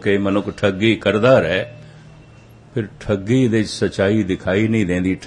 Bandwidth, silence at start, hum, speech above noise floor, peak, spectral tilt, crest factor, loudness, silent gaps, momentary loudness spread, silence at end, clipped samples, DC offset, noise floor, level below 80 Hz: 11 kHz; 0 s; none; 27 dB; -2 dBFS; -6.5 dB/octave; 16 dB; -18 LUFS; none; 12 LU; 0 s; under 0.1%; under 0.1%; -44 dBFS; -48 dBFS